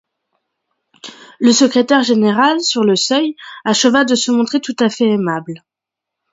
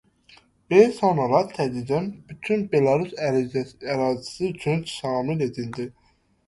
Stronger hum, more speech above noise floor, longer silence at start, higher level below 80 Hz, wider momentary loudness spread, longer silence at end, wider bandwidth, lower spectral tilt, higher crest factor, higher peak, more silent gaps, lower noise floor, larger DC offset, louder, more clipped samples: neither; first, 69 dB vs 33 dB; first, 1.05 s vs 0.7 s; second, -64 dBFS vs -58 dBFS; about the same, 14 LU vs 12 LU; first, 0.75 s vs 0.55 s; second, 8 kHz vs 11.5 kHz; second, -3.5 dB/octave vs -6.5 dB/octave; about the same, 16 dB vs 20 dB; about the same, 0 dBFS vs -2 dBFS; neither; first, -83 dBFS vs -55 dBFS; neither; first, -14 LUFS vs -23 LUFS; neither